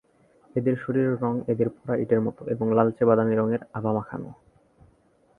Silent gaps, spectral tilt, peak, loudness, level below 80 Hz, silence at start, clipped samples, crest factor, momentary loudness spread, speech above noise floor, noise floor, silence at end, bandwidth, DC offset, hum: none; -11 dB/octave; -4 dBFS; -25 LUFS; -62 dBFS; 0.55 s; under 0.1%; 22 dB; 9 LU; 38 dB; -62 dBFS; 1.05 s; 3.5 kHz; under 0.1%; none